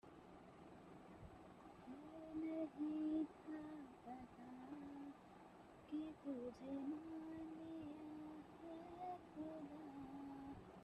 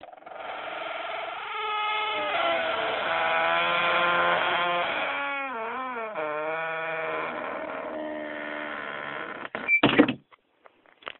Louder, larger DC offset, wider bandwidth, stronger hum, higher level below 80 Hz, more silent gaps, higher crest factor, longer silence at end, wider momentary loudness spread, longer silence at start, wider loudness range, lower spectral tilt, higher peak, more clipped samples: second, -52 LUFS vs -27 LUFS; neither; first, 9.2 kHz vs 4.2 kHz; neither; second, -76 dBFS vs -66 dBFS; neither; second, 18 dB vs 24 dB; about the same, 0 s vs 0.1 s; first, 15 LU vs 12 LU; about the same, 0.05 s vs 0 s; about the same, 5 LU vs 7 LU; first, -7.5 dB/octave vs -1 dB/octave; second, -34 dBFS vs -4 dBFS; neither